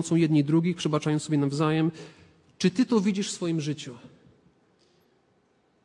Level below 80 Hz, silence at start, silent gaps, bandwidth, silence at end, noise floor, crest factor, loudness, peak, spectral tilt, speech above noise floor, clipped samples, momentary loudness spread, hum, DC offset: -70 dBFS; 0 s; none; 11 kHz; 1.8 s; -67 dBFS; 18 dB; -26 LUFS; -10 dBFS; -6 dB/octave; 42 dB; under 0.1%; 9 LU; none; under 0.1%